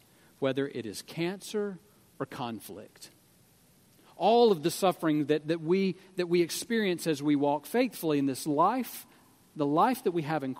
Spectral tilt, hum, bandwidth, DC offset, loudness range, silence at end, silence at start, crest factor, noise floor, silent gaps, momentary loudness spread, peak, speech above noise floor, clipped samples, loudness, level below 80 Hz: -5.5 dB/octave; none; 16 kHz; under 0.1%; 9 LU; 0 s; 0.4 s; 18 dB; -62 dBFS; none; 13 LU; -12 dBFS; 34 dB; under 0.1%; -29 LUFS; -76 dBFS